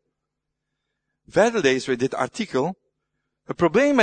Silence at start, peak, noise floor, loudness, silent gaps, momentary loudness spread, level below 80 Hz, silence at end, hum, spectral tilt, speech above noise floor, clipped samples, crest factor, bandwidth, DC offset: 1.35 s; -4 dBFS; -81 dBFS; -22 LUFS; none; 8 LU; -60 dBFS; 0 s; none; -5 dB/octave; 61 dB; under 0.1%; 20 dB; 9.6 kHz; under 0.1%